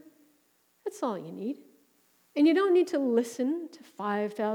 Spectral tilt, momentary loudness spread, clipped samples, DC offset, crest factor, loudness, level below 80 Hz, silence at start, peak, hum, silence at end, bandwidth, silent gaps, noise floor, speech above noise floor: -5.5 dB/octave; 16 LU; under 0.1%; under 0.1%; 16 dB; -28 LUFS; under -90 dBFS; 0.85 s; -14 dBFS; none; 0 s; 16.5 kHz; none; -69 dBFS; 41 dB